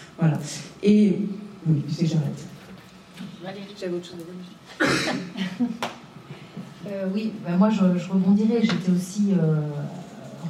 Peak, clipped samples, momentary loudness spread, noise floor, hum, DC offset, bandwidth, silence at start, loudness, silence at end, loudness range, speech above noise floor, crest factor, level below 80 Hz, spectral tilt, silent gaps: -8 dBFS; under 0.1%; 20 LU; -45 dBFS; none; under 0.1%; 13 kHz; 0 s; -24 LUFS; 0 s; 7 LU; 22 dB; 16 dB; -64 dBFS; -6.5 dB/octave; none